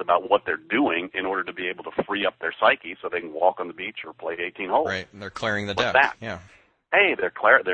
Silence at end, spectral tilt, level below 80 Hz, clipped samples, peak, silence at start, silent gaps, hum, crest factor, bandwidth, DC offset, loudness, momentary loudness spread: 0 s; -4.5 dB/octave; -60 dBFS; under 0.1%; -2 dBFS; 0 s; none; none; 22 dB; 9 kHz; under 0.1%; -24 LUFS; 13 LU